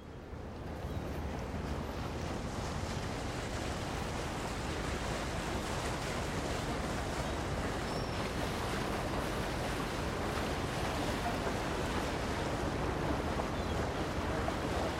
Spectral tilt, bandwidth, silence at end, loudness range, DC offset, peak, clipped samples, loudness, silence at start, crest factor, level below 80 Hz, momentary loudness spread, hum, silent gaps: -5 dB/octave; 16 kHz; 0 s; 3 LU; under 0.1%; -20 dBFS; under 0.1%; -37 LUFS; 0 s; 16 dB; -44 dBFS; 4 LU; none; none